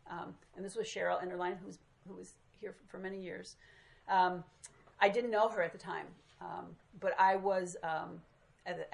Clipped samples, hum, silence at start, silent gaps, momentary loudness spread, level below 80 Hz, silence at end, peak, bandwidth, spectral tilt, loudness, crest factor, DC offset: under 0.1%; none; 0.05 s; none; 23 LU; -74 dBFS; 0.05 s; -14 dBFS; 11.5 kHz; -4.5 dB/octave; -36 LUFS; 24 dB; under 0.1%